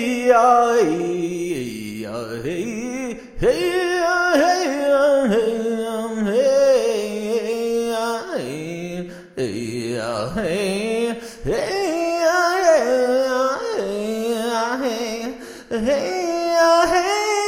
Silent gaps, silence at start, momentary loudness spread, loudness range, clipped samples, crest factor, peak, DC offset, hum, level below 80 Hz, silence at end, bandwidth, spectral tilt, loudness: none; 0 s; 13 LU; 6 LU; under 0.1%; 16 dB; -4 dBFS; under 0.1%; none; -46 dBFS; 0 s; 16 kHz; -4 dB/octave; -20 LUFS